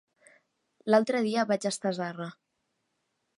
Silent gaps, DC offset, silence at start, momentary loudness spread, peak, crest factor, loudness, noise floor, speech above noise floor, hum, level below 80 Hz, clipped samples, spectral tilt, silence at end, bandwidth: none; under 0.1%; 0.85 s; 16 LU; -8 dBFS; 22 dB; -28 LUFS; -79 dBFS; 52 dB; none; -84 dBFS; under 0.1%; -5 dB/octave; 1.05 s; 11.5 kHz